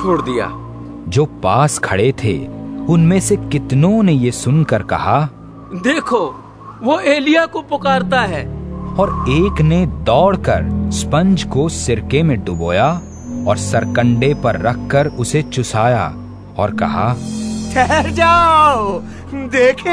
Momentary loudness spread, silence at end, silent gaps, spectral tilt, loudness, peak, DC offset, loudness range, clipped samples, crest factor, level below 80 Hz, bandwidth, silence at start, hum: 11 LU; 0 s; none; -6 dB/octave; -15 LUFS; 0 dBFS; under 0.1%; 2 LU; under 0.1%; 14 dB; -32 dBFS; 11 kHz; 0 s; none